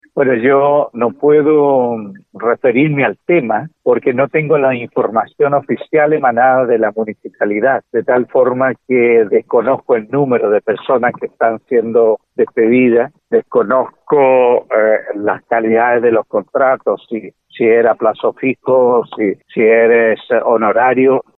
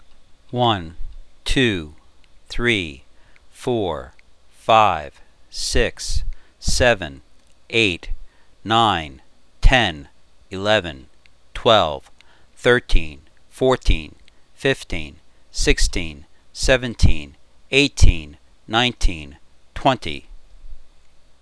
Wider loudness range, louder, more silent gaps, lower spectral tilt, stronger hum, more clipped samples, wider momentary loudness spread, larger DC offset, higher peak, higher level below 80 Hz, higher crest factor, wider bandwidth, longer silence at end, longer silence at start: about the same, 2 LU vs 3 LU; first, -13 LUFS vs -20 LUFS; neither; first, -10.5 dB/octave vs -4 dB/octave; neither; neither; second, 7 LU vs 20 LU; second, under 0.1% vs 0.4%; about the same, 0 dBFS vs 0 dBFS; second, -64 dBFS vs -26 dBFS; second, 12 dB vs 20 dB; second, 4 kHz vs 11 kHz; second, 0.15 s vs 0.55 s; about the same, 0.15 s vs 0.1 s